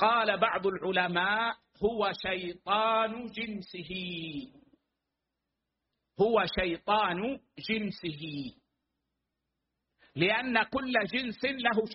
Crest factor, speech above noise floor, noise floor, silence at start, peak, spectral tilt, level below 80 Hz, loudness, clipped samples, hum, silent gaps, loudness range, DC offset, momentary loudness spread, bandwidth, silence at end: 20 dB; 56 dB; -86 dBFS; 0 s; -10 dBFS; -2 dB/octave; -58 dBFS; -30 LUFS; under 0.1%; none; none; 6 LU; under 0.1%; 12 LU; 5.8 kHz; 0 s